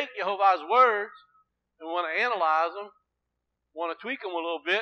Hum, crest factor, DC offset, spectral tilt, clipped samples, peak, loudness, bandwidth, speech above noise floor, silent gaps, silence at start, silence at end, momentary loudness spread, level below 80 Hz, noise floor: none; 20 dB; under 0.1%; -3 dB/octave; under 0.1%; -8 dBFS; -26 LUFS; 6.8 kHz; 56 dB; none; 0 s; 0 s; 19 LU; -86 dBFS; -82 dBFS